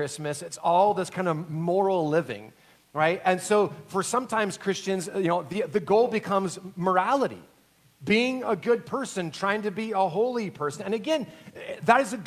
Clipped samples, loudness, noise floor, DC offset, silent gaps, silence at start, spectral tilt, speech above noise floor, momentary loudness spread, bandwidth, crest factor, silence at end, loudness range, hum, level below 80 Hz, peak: under 0.1%; -26 LUFS; -60 dBFS; under 0.1%; none; 0 s; -5 dB/octave; 34 dB; 9 LU; 15 kHz; 22 dB; 0 s; 2 LU; none; -70 dBFS; -4 dBFS